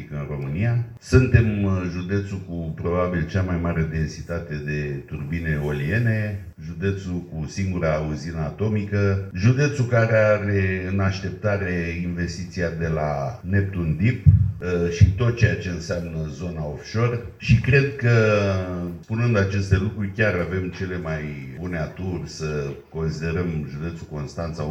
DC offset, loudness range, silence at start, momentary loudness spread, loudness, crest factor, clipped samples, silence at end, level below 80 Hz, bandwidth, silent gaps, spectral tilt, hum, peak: under 0.1%; 5 LU; 0 s; 12 LU; -23 LUFS; 22 dB; under 0.1%; 0 s; -38 dBFS; 8.2 kHz; none; -7.5 dB/octave; none; 0 dBFS